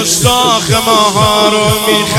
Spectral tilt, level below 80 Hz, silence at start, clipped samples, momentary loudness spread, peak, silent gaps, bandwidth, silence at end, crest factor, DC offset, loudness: -3 dB/octave; -34 dBFS; 0 s; 0.2%; 2 LU; 0 dBFS; none; 19.5 kHz; 0 s; 10 dB; under 0.1%; -9 LUFS